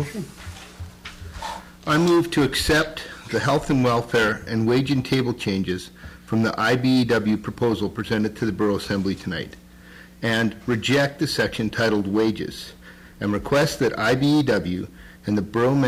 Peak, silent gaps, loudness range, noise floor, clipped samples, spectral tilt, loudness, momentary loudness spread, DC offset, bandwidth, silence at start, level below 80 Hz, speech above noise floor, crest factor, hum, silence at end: -12 dBFS; none; 3 LU; -45 dBFS; under 0.1%; -5.5 dB/octave; -22 LUFS; 16 LU; under 0.1%; 16 kHz; 0 s; -44 dBFS; 23 dB; 10 dB; none; 0 s